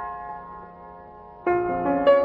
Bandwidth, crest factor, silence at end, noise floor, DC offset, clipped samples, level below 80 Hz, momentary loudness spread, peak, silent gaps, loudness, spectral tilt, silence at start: 4.9 kHz; 18 dB; 0 s; -44 dBFS; under 0.1%; under 0.1%; -52 dBFS; 22 LU; -6 dBFS; none; -24 LUFS; -8.5 dB/octave; 0 s